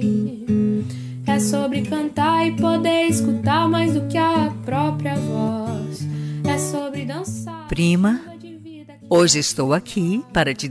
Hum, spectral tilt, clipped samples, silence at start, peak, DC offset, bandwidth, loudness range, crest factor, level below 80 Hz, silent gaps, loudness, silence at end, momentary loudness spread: none; -5 dB/octave; under 0.1%; 0 s; -4 dBFS; under 0.1%; 11 kHz; 4 LU; 16 dB; -48 dBFS; none; -20 LUFS; 0 s; 10 LU